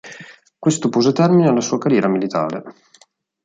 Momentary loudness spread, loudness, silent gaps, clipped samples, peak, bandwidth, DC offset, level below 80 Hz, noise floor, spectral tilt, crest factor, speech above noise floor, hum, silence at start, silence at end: 15 LU; -17 LUFS; none; under 0.1%; -4 dBFS; 9.4 kHz; under 0.1%; -64 dBFS; -54 dBFS; -6 dB/octave; 14 dB; 37 dB; none; 0.05 s; 0.75 s